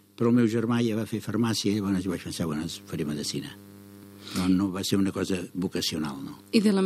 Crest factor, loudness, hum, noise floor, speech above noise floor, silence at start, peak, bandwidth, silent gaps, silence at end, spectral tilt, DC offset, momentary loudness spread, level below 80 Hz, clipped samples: 20 dB; -27 LUFS; none; -47 dBFS; 21 dB; 0.2 s; -6 dBFS; 15 kHz; none; 0 s; -5.5 dB/octave; under 0.1%; 12 LU; -60 dBFS; under 0.1%